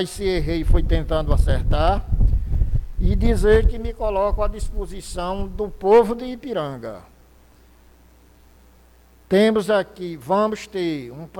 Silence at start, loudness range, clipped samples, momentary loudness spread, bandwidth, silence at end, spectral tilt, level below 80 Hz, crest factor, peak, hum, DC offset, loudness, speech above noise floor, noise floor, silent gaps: 0 s; 4 LU; under 0.1%; 14 LU; 13.5 kHz; 0 s; -7 dB/octave; -24 dBFS; 14 dB; -6 dBFS; none; under 0.1%; -22 LUFS; 32 dB; -51 dBFS; none